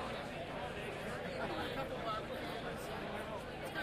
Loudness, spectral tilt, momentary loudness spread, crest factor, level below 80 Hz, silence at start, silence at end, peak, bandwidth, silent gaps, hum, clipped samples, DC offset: -42 LUFS; -5 dB/octave; 3 LU; 14 dB; -58 dBFS; 0 s; 0 s; -28 dBFS; 15.5 kHz; none; none; under 0.1%; under 0.1%